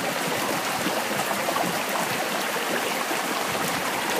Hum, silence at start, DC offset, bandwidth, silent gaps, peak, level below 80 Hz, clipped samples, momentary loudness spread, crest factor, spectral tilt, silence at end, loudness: none; 0 s; under 0.1%; 15.5 kHz; none; -10 dBFS; -64 dBFS; under 0.1%; 1 LU; 16 dB; -2.5 dB/octave; 0 s; -25 LUFS